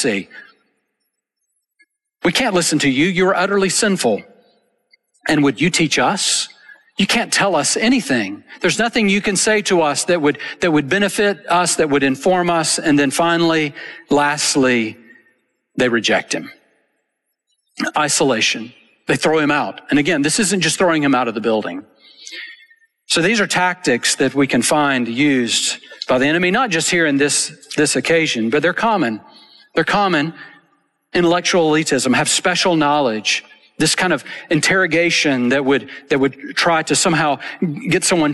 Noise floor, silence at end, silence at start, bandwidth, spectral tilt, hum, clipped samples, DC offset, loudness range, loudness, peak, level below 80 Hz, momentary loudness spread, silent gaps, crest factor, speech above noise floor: -74 dBFS; 0 s; 0 s; 12.5 kHz; -3 dB/octave; none; under 0.1%; under 0.1%; 3 LU; -16 LUFS; -4 dBFS; -54 dBFS; 7 LU; none; 12 dB; 58 dB